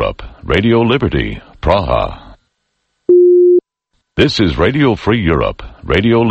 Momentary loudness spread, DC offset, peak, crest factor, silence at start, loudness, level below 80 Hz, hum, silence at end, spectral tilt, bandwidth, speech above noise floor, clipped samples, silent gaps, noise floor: 13 LU; under 0.1%; 0 dBFS; 12 dB; 0 s; -13 LUFS; -28 dBFS; none; 0 s; -7.5 dB/octave; 8 kHz; 55 dB; under 0.1%; none; -68 dBFS